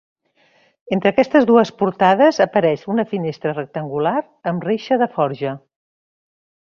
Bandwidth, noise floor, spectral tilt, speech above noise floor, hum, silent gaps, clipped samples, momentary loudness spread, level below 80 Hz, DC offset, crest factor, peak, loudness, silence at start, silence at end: 7.2 kHz; -58 dBFS; -6.5 dB/octave; 41 dB; none; none; under 0.1%; 12 LU; -60 dBFS; under 0.1%; 16 dB; -2 dBFS; -18 LUFS; 0.85 s; 1.2 s